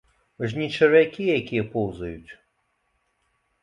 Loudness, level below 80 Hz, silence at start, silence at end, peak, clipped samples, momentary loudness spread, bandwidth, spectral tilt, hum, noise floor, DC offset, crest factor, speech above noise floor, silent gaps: -23 LUFS; -54 dBFS; 0.4 s; 1.3 s; -4 dBFS; under 0.1%; 18 LU; 7.4 kHz; -7 dB/octave; none; -72 dBFS; under 0.1%; 20 dB; 49 dB; none